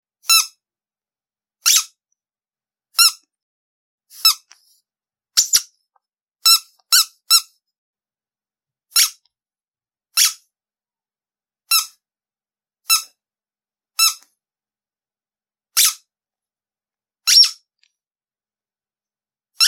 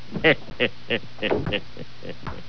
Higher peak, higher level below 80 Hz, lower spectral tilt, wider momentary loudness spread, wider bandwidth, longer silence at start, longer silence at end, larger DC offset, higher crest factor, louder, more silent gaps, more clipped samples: first, 0 dBFS vs -4 dBFS; second, -84 dBFS vs -48 dBFS; second, 6.5 dB/octave vs -6.5 dB/octave; second, 10 LU vs 18 LU; first, 17 kHz vs 5.4 kHz; first, 0.3 s vs 0 s; about the same, 0 s vs 0 s; second, under 0.1% vs 3%; about the same, 22 dB vs 22 dB; first, -15 LUFS vs -24 LUFS; first, 3.43-3.98 s, 6.22-6.26 s, 7.78-7.94 s vs none; neither